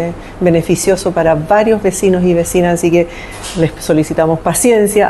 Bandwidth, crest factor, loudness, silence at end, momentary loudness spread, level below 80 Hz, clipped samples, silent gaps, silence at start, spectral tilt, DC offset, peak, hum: 13 kHz; 12 dB; -12 LUFS; 0 s; 6 LU; -34 dBFS; under 0.1%; none; 0 s; -5.5 dB/octave; 0.1%; 0 dBFS; none